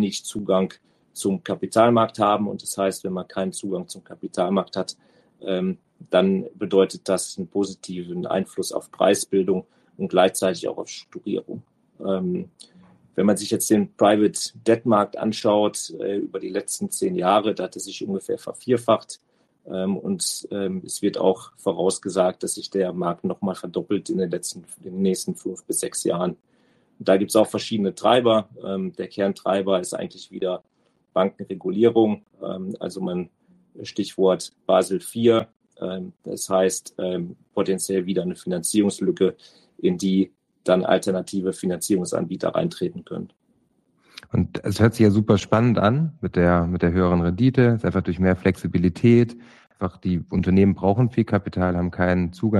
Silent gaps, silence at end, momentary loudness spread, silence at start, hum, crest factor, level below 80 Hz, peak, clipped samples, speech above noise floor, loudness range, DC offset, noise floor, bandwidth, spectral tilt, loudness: 35.56-35.60 s; 0 s; 12 LU; 0 s; none; 18 dB; -52 dBFS; -4 dBFS; under 0.1%; 43 dB; 6 LU; under 0.1%; -65 dBFS; 12.5 kHz; -5.5 dB/octave; -23 LUFS